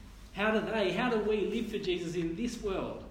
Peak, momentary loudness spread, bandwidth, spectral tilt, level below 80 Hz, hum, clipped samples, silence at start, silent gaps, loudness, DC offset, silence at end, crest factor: -16 dBFS; 6 LU; 16 kHz; -5.5 dB/octave; -52 dBFS; none; under 0.1%; 0 s; none; -32 LUFS; under 0.1%; 0 s; 16 dB